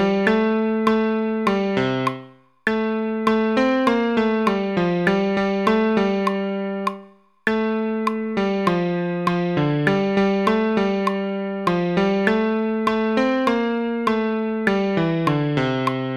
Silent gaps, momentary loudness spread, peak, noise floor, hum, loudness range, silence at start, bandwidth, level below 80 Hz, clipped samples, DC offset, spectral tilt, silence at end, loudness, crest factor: none; 5 LU; -2 dBFS; -46 dBFS; none; 2 LU; 0 s; 10.5 kHz; -54 dBFS; under 0.1%; under 0.1%; -7 dB/octave; 0 s; -21 LUFS; 18 dB